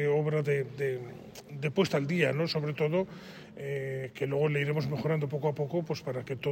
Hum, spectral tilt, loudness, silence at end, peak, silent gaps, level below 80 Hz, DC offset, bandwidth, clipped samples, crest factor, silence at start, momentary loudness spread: none; -7 dB/octave; -31 LUFS; 0 s; -12 dBFS; none; -68 dBFS; under 0.1%; 16 kHz; under 0.1%; 18 dB; 0 s; 11 LU